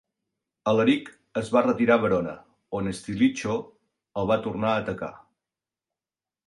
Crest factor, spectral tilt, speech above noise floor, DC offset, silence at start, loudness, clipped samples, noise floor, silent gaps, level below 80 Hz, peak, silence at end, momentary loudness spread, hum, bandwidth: 20 dB; -6 dB/octave; over 66 dB; under 0.1%; 0.65 s; -25 LUFS; under 0.1%; under -90 dBFS; none; -58 dBFS; -6 dBFS; 1.3 s; 14 LU; none; 11.5 kHz